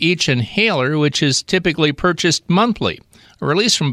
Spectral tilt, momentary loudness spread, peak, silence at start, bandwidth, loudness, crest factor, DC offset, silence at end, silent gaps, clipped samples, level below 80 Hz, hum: -4 dB/octave; 6 LU; -2 dBFS; 0 s; 14 kHz; -16 LUFS; 14 dB; under 0.1%; 0 s; none; under 0.1%; -46 dBFS; none